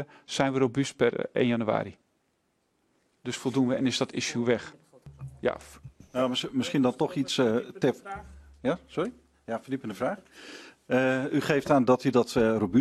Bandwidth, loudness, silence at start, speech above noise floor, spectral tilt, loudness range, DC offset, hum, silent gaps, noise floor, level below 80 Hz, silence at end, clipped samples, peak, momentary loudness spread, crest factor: 13 kHz; -28 LUFS; 0 s; 46 dB; -5.5 dB/octave; 4 LU; under 0.1%; none; none; -74 dBFS; -60 dBFS; 0 s; under 0.1%; -8 dBFS; 17 LU; 20 dB